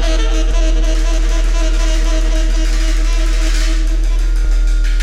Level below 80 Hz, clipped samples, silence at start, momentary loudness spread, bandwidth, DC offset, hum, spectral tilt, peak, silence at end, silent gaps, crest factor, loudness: -12 dBFS; under 0.1%; 0 s; 1 LU; 10.5 kHz; under 0.1%; none; -4.5 dB/octave; -4 dBFS; 0 s; none; 8 dB; -17 LUFS